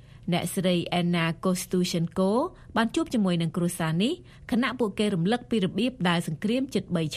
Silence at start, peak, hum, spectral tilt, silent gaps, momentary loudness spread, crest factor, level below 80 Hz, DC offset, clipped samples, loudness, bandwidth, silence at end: 0.15 s; -8 dBFS; none; -5.5 dB/octave; none; 3 LU; 18 dB; -56 dBFS; under 0.1%; under 0.1%; -27 LUFS; 14.5 kHz; 0 s